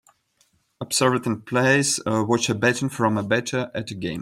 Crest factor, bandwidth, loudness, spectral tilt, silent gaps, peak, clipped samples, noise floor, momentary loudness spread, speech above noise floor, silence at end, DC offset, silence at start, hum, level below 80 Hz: 18 dB; 16 kHz; -22 LUFS; -4 dB/octave; none; -6 dBFS; under 0.1%; -65 dBFS; 10 LU; 43 dB; 0 s; under 0.1%; 0.8 s; none; -60 dBFS